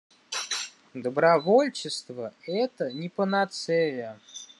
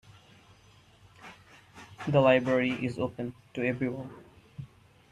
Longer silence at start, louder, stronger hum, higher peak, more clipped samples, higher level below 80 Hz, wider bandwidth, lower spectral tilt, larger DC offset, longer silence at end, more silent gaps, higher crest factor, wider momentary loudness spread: second, 0.3 s vs 1.2 s; about the same, -27 LUFS vs -28 LUFS; neither; about the same, -8 dBFS vs -10 dBFS; neither; second, -80 dBFS vs -64 dBFS; about the same, 12 kHz vs 11 kHz; second, -4 dB/octave vs -7.5 dB/octave; neither; second, 0.15 s vs 0.45 s; neither; about the same, 20 dB vs 22 dB; second, 16 LU vs 27 LU